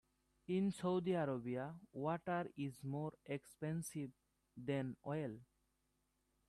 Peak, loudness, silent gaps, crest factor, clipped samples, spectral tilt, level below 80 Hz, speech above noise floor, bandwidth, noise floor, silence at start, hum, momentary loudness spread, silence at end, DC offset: -28 dBFS; -44 LUFS; none; 16 dB; under 0.1%; -7 dB/octave; -78 dBFS; 41 dB; 13 kHz; -83 dBFS; 0.5 s; none; 11 LU; 1.05 s; under 0.1%